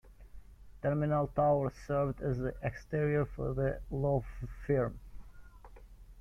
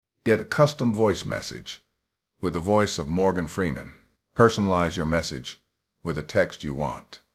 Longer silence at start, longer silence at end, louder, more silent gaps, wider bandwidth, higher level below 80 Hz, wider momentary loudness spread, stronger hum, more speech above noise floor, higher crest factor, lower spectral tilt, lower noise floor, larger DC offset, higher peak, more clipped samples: second, 0.05 s vs 0.25 s; second, 0 s vs 0.2 s; second, -34 LUFS vs -25 LUFS; neither; second, 7 kHz vs 15 kHz; about the same, -48 dBFS vs -48 dBFS; second, 8 LU vs 16 LU; first, 50 Hz at -55 dBFS vs none; second, 20 dB vs 56 dB; second, 16 dB vs 22 dB; first, -9.5 dB/octave vs -5.5 dB/octave; second, -53 dBFS vs -80 dBFS; neither; second, -18 dBFS vs -2 dBFS; neither